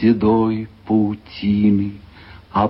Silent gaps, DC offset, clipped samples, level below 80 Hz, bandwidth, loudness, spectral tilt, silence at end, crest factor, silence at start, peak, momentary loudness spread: none; under 0.1%; under 0.1%; -46 dBFS; 5.6 kHz; -19 LUFS; -10.5 dB/octave; 0 s; 14 dB; 0 s; -4 dBFS; 9 LU